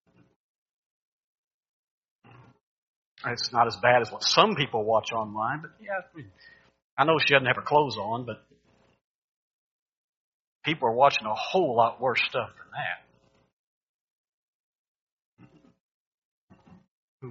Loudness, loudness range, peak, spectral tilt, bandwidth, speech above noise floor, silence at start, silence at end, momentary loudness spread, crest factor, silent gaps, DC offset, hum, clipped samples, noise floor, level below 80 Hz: -25 LUFS; 10 LU; -2 dBFS; -2 dB/octave; 7.4 kHz; 38 dB; 3.25 s; 0 s; 14 LU; 26 dB; 6.82-6.97 s, 9.04-10.61 s, 13.53-15.37 s, 15.80-16.48 s, 16.90-17.20 s; under 0.1%; none; under 0.1%; -64 dBFS; -70 dBFS